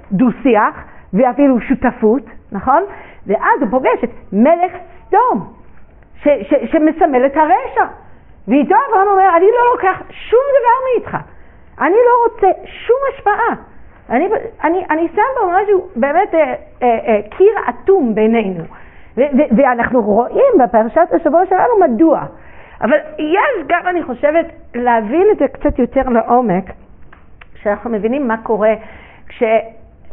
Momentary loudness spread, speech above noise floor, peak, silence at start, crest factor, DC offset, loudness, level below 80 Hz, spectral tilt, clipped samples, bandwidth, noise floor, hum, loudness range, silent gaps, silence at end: 9 LU; 26 dB; 0 dBFS; 0.1 s; 14 dB; 0.7%; -14 LUFS; -40 dBFS; -1.5 dB/octave; under 0.1%; 3.7 kHz; -39 dBFS; none; 3 LU; none; 0 s